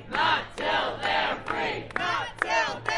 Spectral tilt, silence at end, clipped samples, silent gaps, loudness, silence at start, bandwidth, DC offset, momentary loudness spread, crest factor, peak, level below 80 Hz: -3 dB/octave; 0 s; under 0.1%; none; -27 LUFS; 0 s; 11.5 kHz; under 0.1%; 5 LU; 22 dB; -6 dBFS; -52 dBFS